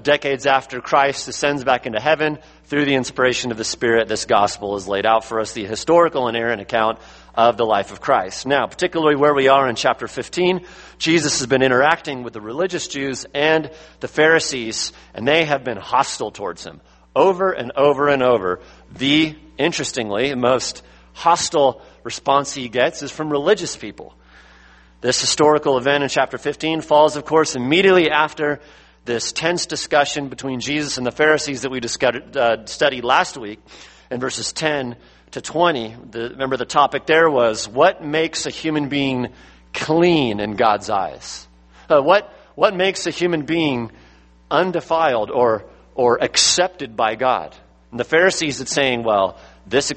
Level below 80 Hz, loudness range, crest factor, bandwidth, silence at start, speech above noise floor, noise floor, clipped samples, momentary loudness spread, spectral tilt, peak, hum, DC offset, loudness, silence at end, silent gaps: -52 dBFS; 3 LU; 18 dB; 8.8 kHz; 0.05 s; 29 dB; -48 dBFS; under 0.1%; 12 LU; -3.5 dB/octave; 0 dBFS; none; under 0.1%; -18 LUFS; 0 s; none